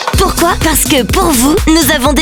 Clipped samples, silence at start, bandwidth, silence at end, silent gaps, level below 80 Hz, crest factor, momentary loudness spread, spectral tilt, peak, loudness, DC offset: under 0.1%; 0 s; over 20 kHz; 0 s; none; -20 dBFS; 10 dB; 2 LU; -3.5 dB/octave; 0 dBFS; -9 LUFS; under 0.1%